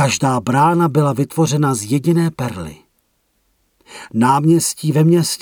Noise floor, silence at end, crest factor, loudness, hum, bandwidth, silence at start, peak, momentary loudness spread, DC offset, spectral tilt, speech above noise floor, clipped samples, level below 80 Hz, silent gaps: -64 dBFS; 0.05 s; 14 dB; -16 LUFS; none; 18 kHz; 0 s; -2 dBFS; 11 LU; under 0.1%; -5.5 dB/octave; 49 dB; under 0.1%; -52 dBFS; none